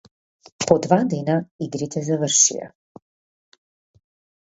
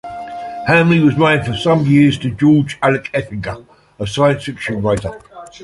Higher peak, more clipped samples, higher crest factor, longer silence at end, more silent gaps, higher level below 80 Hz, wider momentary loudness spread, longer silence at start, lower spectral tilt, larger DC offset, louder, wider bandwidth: about the same, 0 dBFS vs 0 dBFS; neither; first, 22 dB vs 14 dB; first, 1.75 s vs 0 s; first, 1.51-1.59 s vs none; second, -60 dBFS vs -42 dBFS; about the same, 14 LU vs 16 LU; first, 0.6 s vs 0.05 s; second, -4 dB/octave vs -7 dB/octave; neither; second, -20 LUFS vs -15 LUFS; second, 8 kHz vs 11.5 kHz